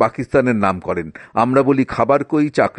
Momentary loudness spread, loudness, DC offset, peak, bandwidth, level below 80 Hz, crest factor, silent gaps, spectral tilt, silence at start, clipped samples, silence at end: 9 LU; -17 LUFS; under 0.1%; -2 dBFS; 9.2 kHz; -48 dBFS; 16 dB; none; -7.5 dB/octave; 0 s; under 0.1%; 0.1 s